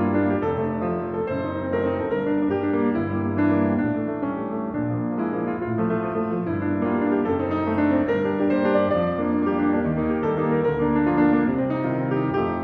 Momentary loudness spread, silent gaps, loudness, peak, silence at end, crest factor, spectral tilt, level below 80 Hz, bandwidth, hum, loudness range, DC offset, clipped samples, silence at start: 6 LU; none; -23 LUFS; -8 dBFS; 0 s; 14 dB; -10.5 dB/octave; -50 dBFS; 4.6 kHz; none; 3 LU; under 0.1%; under 0.1%; 0 s